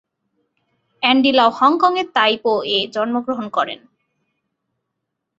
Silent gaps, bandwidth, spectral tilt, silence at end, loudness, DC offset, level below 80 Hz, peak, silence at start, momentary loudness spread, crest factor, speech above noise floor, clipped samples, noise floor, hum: none; 7.8 kHz; -4.5 dB/octave; 1.65 s; -17 LUFS; under 0.1%; -66 dBFS; -2 dBFS; 1 s; 9 LU; 18 dB; 61 dB; under 0.1%; -78 dBFS; none